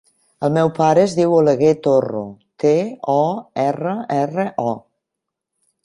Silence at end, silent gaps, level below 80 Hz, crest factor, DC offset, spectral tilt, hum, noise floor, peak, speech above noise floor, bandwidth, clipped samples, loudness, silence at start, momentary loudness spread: 1.05 s; none; -60 dBFS; 16 dB; under 0.1%; -7 dB/octave; none; -81 dBFS; -2 dBFS; 64 dB; 11 kHz; under 0.1%; -18 LUFS; 0.4 s; 10 LU